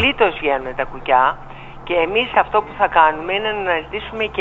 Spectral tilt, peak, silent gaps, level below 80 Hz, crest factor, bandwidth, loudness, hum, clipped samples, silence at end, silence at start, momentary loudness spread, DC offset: -6 dB/octave; 0 dBFS; none; -40 dBFS; 18 dB; 7.6 kHz; -18 LUFS; none; under 0.1%; 0 s; 0 s; 11 LU; under 0.1%